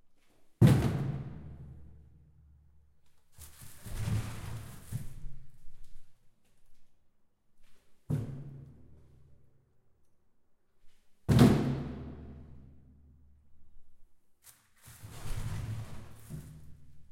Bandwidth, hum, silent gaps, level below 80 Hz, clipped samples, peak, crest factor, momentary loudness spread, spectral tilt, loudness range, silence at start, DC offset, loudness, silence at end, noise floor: 16.5 kHz; none; none; -50 dBFS; under 0.1%; -8 dBFS; 26 dB; 28 LU; -7.5 dB/octave; 18 LU; 0.4 s; under 0.1%; -31 LUFS; 0.05 s; -65 dBFS